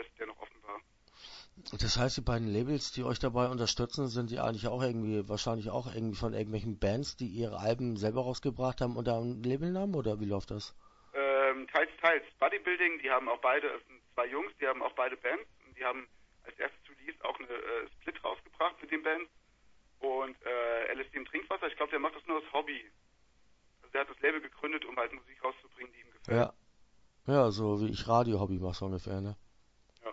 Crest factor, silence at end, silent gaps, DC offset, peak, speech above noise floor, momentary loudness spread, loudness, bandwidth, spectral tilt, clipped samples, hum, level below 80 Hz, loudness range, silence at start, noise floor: 22 dB; 0 s; none; under 0.1%; -12 dBFS; 33 dB; 15 LU; -34 LUFS; 7.6 kHz; -4 dB/octave; under 0.1%; none; -54 dBFS; 6 LU; 0 s; -67 dBFS